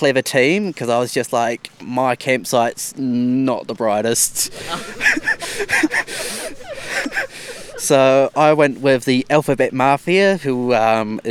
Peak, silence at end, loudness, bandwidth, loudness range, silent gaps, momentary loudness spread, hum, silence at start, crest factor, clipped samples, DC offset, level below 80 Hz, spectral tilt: 0 dBFS; 0 s; -17 LUFS; 18 kHz; 4 LU; none; 10 LU; none; 0 s; 18 dB; under 0.1%; under 0.1%; -50 dBFS; -4 dB/octave